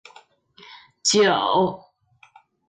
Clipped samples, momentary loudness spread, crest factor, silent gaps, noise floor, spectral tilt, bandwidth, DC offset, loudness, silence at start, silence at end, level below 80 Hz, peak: under 0.1%; 8 LU; 18 dB; none; -56 dBFS; -3 dB/octave; 9.6 kHz; under 0.1%; -20 LUFS; 0.7 s; 0.9 s; -66 dBFS; -6 dBFS